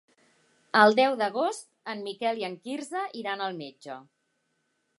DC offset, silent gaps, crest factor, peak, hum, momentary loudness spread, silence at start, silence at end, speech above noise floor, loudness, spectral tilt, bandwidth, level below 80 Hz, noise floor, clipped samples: under 0.1%; none; 24 dB; -4 dBFS; none; 20 LU; 0.75 s; 0.95 s; 49 dB; -27 LUFS; -4 dB/octave; 11.5 kHz; -86 dBFS; -76 dBFS; under 0.1%